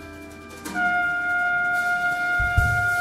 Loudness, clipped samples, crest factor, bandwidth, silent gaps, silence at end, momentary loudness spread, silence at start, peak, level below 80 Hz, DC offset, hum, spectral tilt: -22 LUFS; under 0.1%; 16 dB; 16 kHz; none; 0 s; 17 LU; 0 s; -6 dBFS; -36 dBFS; under 0.1%; none; -4.5 dB/octave